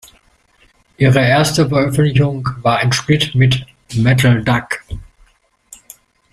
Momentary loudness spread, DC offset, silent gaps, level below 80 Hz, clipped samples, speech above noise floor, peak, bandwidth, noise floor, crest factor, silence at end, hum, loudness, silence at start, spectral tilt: 11 LU; under 0.1%; none; -40 dBFS; under 0.1%; 40 dB; -2 dBFS; 14.5 kHz; -54 dBFS; 14 dB; 1.3 s; none; -14 LUFS; 1 s; -5.5 dB/octave